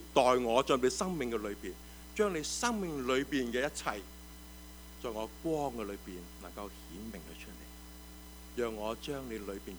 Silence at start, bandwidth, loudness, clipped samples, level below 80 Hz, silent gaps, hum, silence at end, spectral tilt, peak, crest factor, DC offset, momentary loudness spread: 0 s; over 20 kHz; -35 LUFS; under 0.1%; -54 dBFS; none; none; 0 s; -4 dB/octave; -12 dBFS; 24 dB; under 0.1%; 21 LU